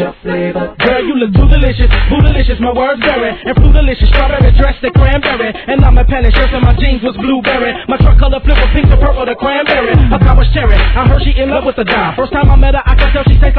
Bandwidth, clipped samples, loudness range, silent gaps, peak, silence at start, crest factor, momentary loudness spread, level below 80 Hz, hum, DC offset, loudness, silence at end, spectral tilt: 4.5 kHz; 2%; 1 LU; none; 0 dBFS; 0 s; 8 dB; 5 LU; -10 dBFS; none; 0.5%; -11 LUFS; 0 s; -9.5 dB/octave